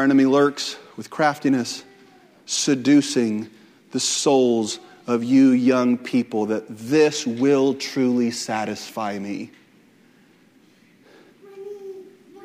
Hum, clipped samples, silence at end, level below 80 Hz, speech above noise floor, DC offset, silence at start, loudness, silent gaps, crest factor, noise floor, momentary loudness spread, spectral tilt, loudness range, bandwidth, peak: none; under 0.1%; 0 s; -72 dBFS; 35 dB; under 0.1%; 0 s; -20 LUFS; none; 16 dB; -55 dBFS; 19 LU; -4 dB/octave; 12 LU; 14.5 kHz; -4 dBFS